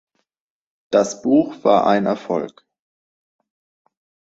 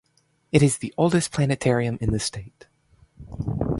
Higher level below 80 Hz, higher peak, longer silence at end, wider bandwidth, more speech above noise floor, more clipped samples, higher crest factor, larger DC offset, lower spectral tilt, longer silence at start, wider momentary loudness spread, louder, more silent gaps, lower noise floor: second, -64 dBFS vs -44 dBFS; about the same, -2 dBFS vs -4 dBFS; first, 1.8 s vs 0 s; second, 8 kHz vs 11.5 kHz; first, 70 dB vs 37 dB; neither; about the same, 20 dB vs 20 dB; neither; about the same, -5.5 dB/octave vs -5.5 dB/octave; first, 0.9 s vs 0.55 s; second, 9 LU vs 12 LU; first, -18 LUFS vs -23 LUFS; neither; first, -87 dBFS vs -59 dBFS